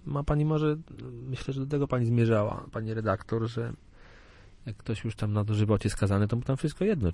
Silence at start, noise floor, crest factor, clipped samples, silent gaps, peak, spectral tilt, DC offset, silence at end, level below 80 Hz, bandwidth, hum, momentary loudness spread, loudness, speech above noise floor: 0.05 s; -52 dBFS; 16 dB; under 0.1%; none; -12 dBFS; -8 dB/octave; under 0.1%; 0 s; -46 dBFS; 11.5 kHz; none; 12 LU; -29 LUFS; 24 dB